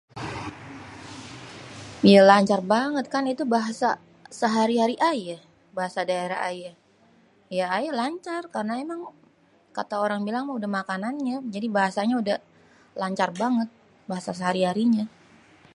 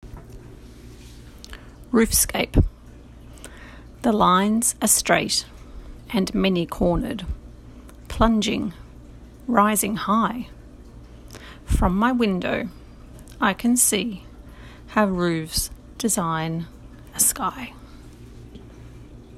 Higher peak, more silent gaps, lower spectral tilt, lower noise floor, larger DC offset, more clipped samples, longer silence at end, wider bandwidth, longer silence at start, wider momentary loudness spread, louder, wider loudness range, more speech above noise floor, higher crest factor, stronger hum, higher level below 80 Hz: about the same, -2 dBFS vs -2 dBFS; neither; first, -5.5 dB/octave vs -4 dB/octave; first, -60 dBFS vs -44 dBFS; neither; neither; first, 0.65 s vs 0 s; second, 11.5 kHz vs 16 kHz; about the same, 0.15 s vs 0.05 s; second, 18 LU vs 25 LU; second, -24 LUFS vs -21 LUFS; first, 9 LU vs 4 LU; first, 36 dB vs 23 dB; about the same, 24 dB vs 22 dB; neither; second, -64 dBFS vs -36 dBFS